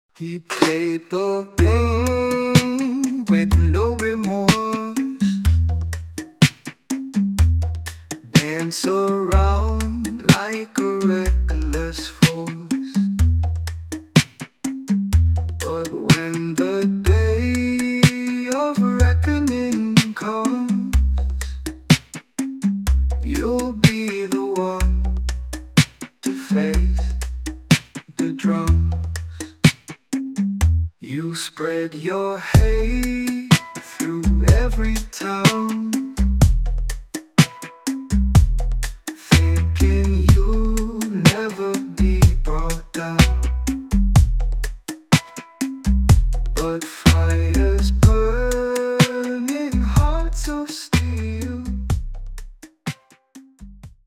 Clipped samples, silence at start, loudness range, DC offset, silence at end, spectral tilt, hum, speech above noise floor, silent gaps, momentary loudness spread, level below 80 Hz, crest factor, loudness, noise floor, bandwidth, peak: under 0.1%; 0.2 s; 3 LU; under 0.1%; 0.2 s; -5.5 dB/octave; none; 28 dB; none; 11 LU; -24 dBFS; 18 dB; -20 LUFS; -47 dBFS; 16 kHz; 0 dBFS